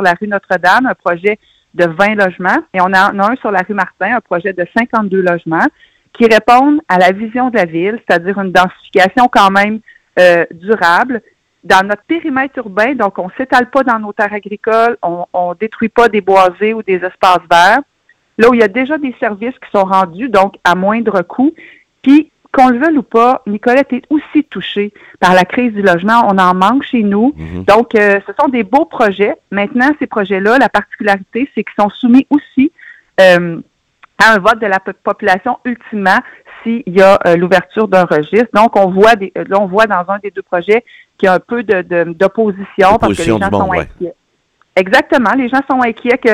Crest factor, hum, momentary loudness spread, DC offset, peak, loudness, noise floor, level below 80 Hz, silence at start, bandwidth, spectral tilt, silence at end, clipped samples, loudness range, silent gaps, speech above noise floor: 12 dB; none; 9 LU; under 0.1%; 0 dBFS; -11 LUFS; -57 dBFS; -46 dBFS; 0 s; 17.5 kHz; -6 dB/octave; 0 s; 0.6%; 3 LU; none; 46 dB